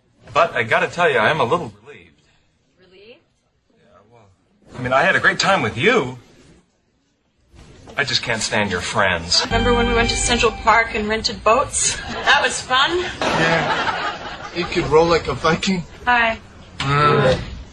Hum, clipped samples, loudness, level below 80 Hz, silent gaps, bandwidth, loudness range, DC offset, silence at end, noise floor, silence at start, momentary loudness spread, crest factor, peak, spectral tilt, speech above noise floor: none; under 0.1%; -17 LUFS; -36 dBFS; none; 10.5 kHz; 6 LU; under 0.1%; 0 s; -64 dBFS; 0.25 s; 8 LU; 18 dB; -2 dBFS; -3.5 dB/octave; 46 dB